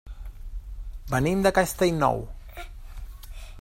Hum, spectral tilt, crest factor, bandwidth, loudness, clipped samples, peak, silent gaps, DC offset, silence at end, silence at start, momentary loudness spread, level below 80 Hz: none; -5.5 dB/octave; 20 dB; 16 kHz; -24 LUFS; under 0.1%; -8 dBFS; none; under 0.1%; 0 s; 0.05 s; 22 LU; -38 dBFS